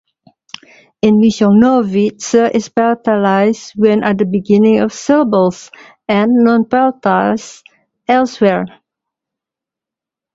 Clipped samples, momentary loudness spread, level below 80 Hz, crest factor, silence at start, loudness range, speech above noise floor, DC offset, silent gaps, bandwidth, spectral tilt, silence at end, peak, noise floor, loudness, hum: under 0.1%; 17 LU; -54 dBFS; 14 dB; 1.05 s; 4 LU; 74 dB; under 0.1%; none; 7.8 kHz; -6 dB/octave; 1.65 s; 0 dBFS; -85 dBFS; -12 LUFS; none